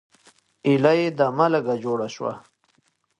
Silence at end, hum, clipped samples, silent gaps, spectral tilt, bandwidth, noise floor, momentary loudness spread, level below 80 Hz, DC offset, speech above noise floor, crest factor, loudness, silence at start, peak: 0.8 s; none; under 0.1%; none; -7 dB/octave; 10.5 kHz; -67 dBFS; 13 LU; -70 dBFS; under 0.1%; 46 dB; 18 dB; -22 LUFS; 0.65 s; -4 dBFS